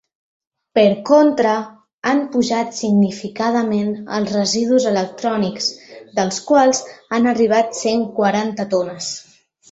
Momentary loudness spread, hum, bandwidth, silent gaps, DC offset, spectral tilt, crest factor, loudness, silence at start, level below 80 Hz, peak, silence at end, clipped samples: 9 LU; none; 8 kHz; 1.94-2.02 s; under 0.1%; -4.5 dB/octave; 16 dB; -18 LUFS; 0.75 s; -60 dBFS; -2 dBFS; 0.5 s; under 0.1%